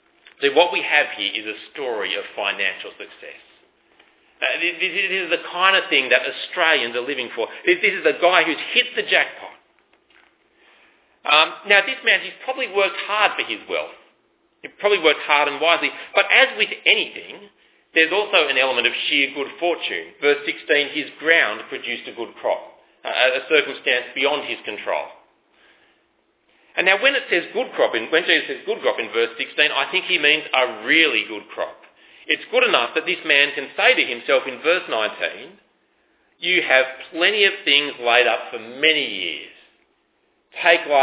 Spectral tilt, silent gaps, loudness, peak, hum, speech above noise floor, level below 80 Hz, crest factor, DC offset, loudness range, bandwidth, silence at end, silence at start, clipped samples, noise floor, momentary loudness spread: -5.5 dB/octave; none; -18 LUFS; 0 dBFS; none; 45 dB; -78 dBFS; 20 dB; under 0.1%; 4 LU; 4 kHz; 0 s; 0.4 s; under 0.1%; -65 dBFS; 12 LU